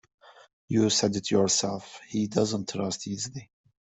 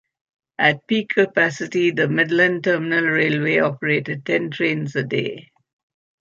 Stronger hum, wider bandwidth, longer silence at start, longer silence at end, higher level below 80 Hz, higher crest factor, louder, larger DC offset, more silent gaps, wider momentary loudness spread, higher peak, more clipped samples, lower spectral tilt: neither; first, 8.4 kHz vs 7.6 kHz; second, 0.25 s vs 0.6 s; second, 0.35 s vs 0.8 s; about the same, -64 dBFS vs -68 dBFS; about the same, 18 dB vs 18 dB; second, -27 LUFS vs -19 LUFS; neither; first, 0.53-0.68 s vs none; first, 11 LU vs 7 LU; second, -10 dBFS vs -2 dBFS; neither; second, -4 dB/octave vs -6 dB/octave